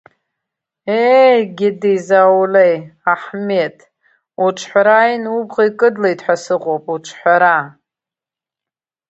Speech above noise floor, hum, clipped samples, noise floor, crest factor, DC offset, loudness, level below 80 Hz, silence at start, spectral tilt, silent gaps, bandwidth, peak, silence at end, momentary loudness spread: 75 dB; none; under 0.1%; -88 dBFS; 14 dB; under 0.1%; -14 LUFS; -68 dBFS; 0.85 s; -5 dB/octave; none; 8.2 kHz; 0 dBFS; 1.4 s; 9 LU